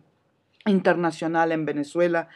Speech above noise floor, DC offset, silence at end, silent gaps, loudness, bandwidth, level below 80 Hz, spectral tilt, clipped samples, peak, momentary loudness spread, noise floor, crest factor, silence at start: 44 dB; under 0.1%; 0.1 s; none; -24 LUFS; 11 kHz; -80 dBFS; -7 dB/octave; under 0.1%; -6 dBFS; 6 LU; -67 dBFS; 18 dB; 0.65 s